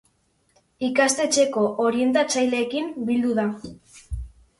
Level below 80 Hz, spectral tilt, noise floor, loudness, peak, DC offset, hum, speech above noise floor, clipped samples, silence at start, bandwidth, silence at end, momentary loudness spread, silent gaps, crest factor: -44 dBFS; -3.5 dB/octave; -66 dBFS; -22 LUFS; -6 dBFS; under 0.1%; none; 44 dB; under 0.1%; 0.8 s; 11.5 kHz; 0.3 s; 17 LU; none; 18 dB